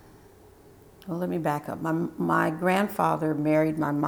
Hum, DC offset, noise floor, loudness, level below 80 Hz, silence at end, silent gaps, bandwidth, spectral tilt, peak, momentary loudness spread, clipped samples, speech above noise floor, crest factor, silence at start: none; under 0.1%; -53 dBFS; -26 LUFS; -62 dBFS; 0 s; none; over 20 kHz; -7 dB/octave; -10 dBFS; 7 LU; under 0.1%; 27 dB; 16 dB; 1.05 s